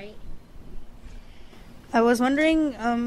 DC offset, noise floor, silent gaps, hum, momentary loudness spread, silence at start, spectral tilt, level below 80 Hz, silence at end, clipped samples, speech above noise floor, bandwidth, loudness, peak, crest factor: under 0.1%; -44 dBFS; none; none; 6 LU; 0 s; -4.5 dB/octave; -42 dBFS; 0 s; under 0.1%; 22 dB; 13.5 kHz; -22 LUFS; -8 dBFS; 16 dB